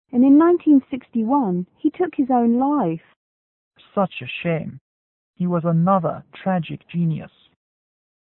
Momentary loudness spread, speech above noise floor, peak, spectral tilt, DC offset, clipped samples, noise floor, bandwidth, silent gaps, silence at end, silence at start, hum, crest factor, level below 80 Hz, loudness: 13 LU; over 71 dB; -6 dBFS; -12.5 dB/octave; under 0.1%; under 0.1%; under -90 dBFS; 4 kHz; 3.16-3.71 s, 4.81-5.34 s; 0.95 s; 0.15 s; none; 14 dB; -62 dBFS; -20 LUFS